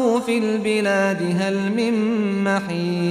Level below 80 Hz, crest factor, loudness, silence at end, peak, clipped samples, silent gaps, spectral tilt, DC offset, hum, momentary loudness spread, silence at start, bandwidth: -62 dBFS; 12 dB; -20 LUFS; 0 s; -8 dBFS; under 0.1%; none; -6 dB/octave; under 0.1%; none; 2 LU; 0 s; 13.5 kHz